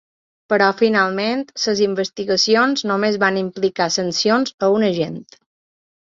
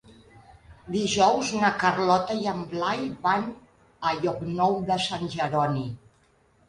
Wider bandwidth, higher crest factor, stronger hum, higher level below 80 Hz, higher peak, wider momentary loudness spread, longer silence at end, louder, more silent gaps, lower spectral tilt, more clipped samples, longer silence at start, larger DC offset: second, 7.8 kHz vs 11.5 kHz; about the same, 16 dB vs 18 dB; neither; about the same, -62 dBFS vs -58 dBFS; first, -2 dBFS vs -8 dBFS; about the same, 7 LU vs 9 LU; first, 0.9 s vs 0.7 s; first, -18 LUFS vs -25 LUFS; first, 4.54-4.58 s vs none; about the same, -4 dB/octave vs -4.5 dB/octave; neither; first, 0.5 s vs 0.1 s; neither